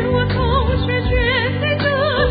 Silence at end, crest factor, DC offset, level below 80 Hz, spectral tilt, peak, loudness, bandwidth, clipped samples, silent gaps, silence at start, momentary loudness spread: 0 s; 12 dB; under 0.1%; -24 dBFS; -11.5 dB/octave; -4 dBFS; -17 LUFS; 5 kHz; under 0.1%; none; 0 s; 2 LU